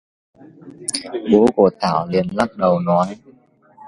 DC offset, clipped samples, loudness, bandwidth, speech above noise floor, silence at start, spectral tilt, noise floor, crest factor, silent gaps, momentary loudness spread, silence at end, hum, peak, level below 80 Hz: under 0.1%; under 0.1%; -18 LUFS; 11.5 kHz; 34 dB; 0.65 s; -5.5 dB/octave; -51 dBFS; 18 dB; none; 10 LU; 0 s; none; 0 dBFS; -52 dBFS